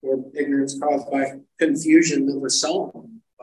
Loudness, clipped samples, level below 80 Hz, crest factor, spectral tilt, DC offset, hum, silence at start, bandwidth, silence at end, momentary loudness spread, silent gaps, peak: -21 LUFS; under 0.1%; -72 dBFS; 16 dB; -3.5 dB/octave; under 0.1%; none; 0.05 s; 11.5 kHz; 0.25 s; 10 LU; none; -4 dBFS